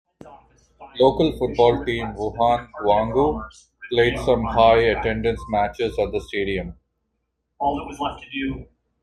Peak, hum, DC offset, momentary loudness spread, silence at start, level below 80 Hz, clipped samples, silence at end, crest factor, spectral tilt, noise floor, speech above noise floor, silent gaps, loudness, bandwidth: -2 dBFS; none; under 0.1%; 12 LU; 0.25 s; -40 dBFS; under 0.1%; 0.4 s; 20 dB; -6.5 dB/octave; -75 dBFS; 54 dB; none; -21 LUFS; 12 kHz